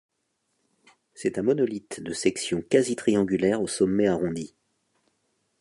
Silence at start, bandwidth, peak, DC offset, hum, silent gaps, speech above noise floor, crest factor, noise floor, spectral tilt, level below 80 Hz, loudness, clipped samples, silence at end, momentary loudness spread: 1.2 s; 11.5 kHz; -6 dBFS; under 0.1%; none; none; 51 dB; 20 dB; -76 dBFS; -5 dB/octave; -60 dBFS; -25 LUFS; under 0.1%; 1.15 s; 10 LU